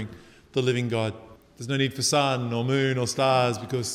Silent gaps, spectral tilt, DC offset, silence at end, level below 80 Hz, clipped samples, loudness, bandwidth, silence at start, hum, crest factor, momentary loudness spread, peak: none; -4.5 dB/octave; under 0.1%; 0 s; -62 dBFS; under 0.1%; -25 LUFS; 16 kHz; 0 s; none; 16 dB; 10 LU; -8 dBFS